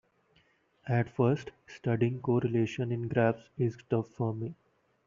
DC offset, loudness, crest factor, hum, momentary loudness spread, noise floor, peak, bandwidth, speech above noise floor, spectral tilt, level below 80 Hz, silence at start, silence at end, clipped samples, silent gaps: under 0.1%; -31 LUFS; 18 dB; none; 10 LU; -69 dBFS; -14 dBFS; 7.2 kHz; 38 dB; -8 dB/octave; -66 dBFS; 0.85 s; 0.55 s; under 0.1%; none